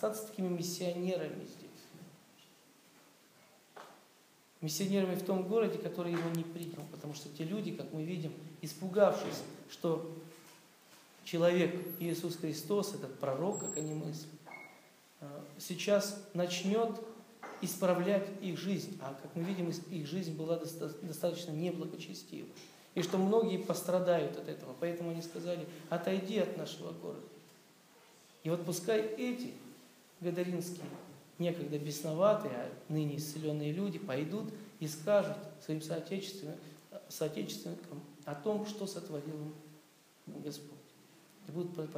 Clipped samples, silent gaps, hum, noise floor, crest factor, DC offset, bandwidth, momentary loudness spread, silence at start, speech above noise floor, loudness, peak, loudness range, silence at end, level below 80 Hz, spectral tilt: under 0.1%; none; none; -65 dBFS; 22 dB; under 0.1%; 15.5 kHz; 19 LU; 0 s; 29 dB; -37 LUFS; -14 dBFS; 6 LU; 0 s; under -90 dBFS; -5.5 dB/octave